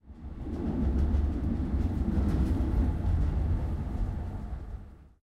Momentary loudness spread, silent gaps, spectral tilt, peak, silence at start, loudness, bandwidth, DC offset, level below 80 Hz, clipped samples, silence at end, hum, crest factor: 12 LU; none; -9.5 dB/octave; -16 dBFS; 0.05 s; -31 LUFS; 5.8 kHz; under 0.1%; -32 dBFS; under 0.1%; 0.2 s; none; 14 dB